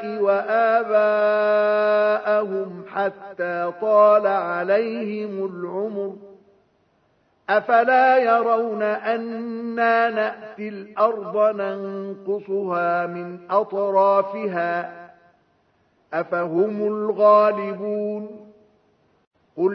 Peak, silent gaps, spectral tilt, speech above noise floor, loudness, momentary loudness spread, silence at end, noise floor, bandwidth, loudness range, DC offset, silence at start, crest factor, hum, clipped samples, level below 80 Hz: -4 dBFS; 19.27-19.31 s; -8 dB/octave; 43 dB; -21 LUFS; 14 LU; 0 s; -64 dBFS; 5.8 kHz; 4 LU; under 0.1%; 0 s; 16 dB; none; under 0.1%; -78 dBFS